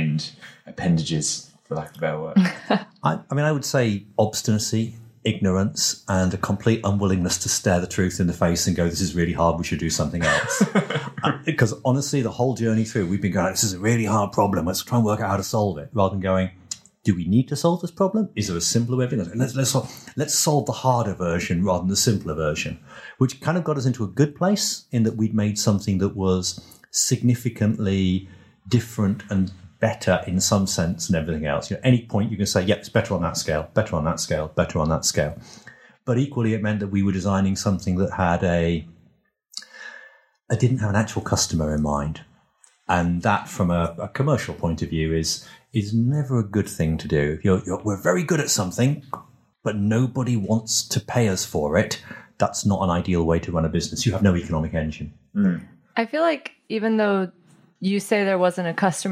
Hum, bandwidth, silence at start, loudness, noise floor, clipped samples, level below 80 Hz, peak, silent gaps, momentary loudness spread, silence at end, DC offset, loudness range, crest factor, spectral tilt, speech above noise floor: none; 15.5 kHz; 0 s; -23 LUFS; -61 dBFS; under 0.1%; -44 dBFS; -6 dBFS; none; 7 LU; 0 s; under 0.1%; 2 LU; 18 dB; -5 dB/octave; 39 dB